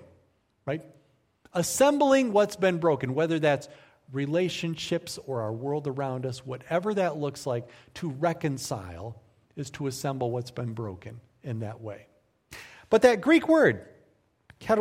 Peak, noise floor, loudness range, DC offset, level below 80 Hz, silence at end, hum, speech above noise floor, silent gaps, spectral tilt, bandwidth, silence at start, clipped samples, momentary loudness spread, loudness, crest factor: -6 dBFS; -67 dBFS; 10 LU; under 0.1%; -64 dBFS; 0 s; none; 40 dB; none; -5.5 dB/octave; 16 kHz; 0.65 s; under 0.1%; 20 LU; -27 LUFS; 22 dB